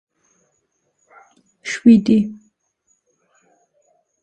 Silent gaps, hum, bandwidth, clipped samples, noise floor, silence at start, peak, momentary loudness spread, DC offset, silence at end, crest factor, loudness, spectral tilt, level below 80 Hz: none; none; 8.8 kHz; under 0.1%; -69 dBFS; 1.65 s; 0 dBFS; 16 LU; under 0.1%; 1.9 s; 20 dB; -15 LUFS; -6.5 dB/octave; -58 dBFS